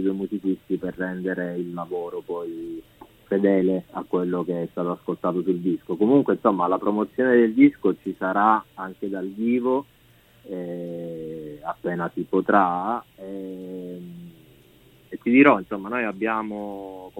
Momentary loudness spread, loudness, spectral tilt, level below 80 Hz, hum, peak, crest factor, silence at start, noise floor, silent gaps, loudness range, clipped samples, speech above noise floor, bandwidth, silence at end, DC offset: 17 LU; -23 LUFS; -8.5 dB/octave; -62 dBFS; none; -2 dBFS; 22 dB; 0 s; -55 dBFS; none; 7 LU; under 0.1%; 31 dB; 4.1 kHz; 0 s; under 0.1%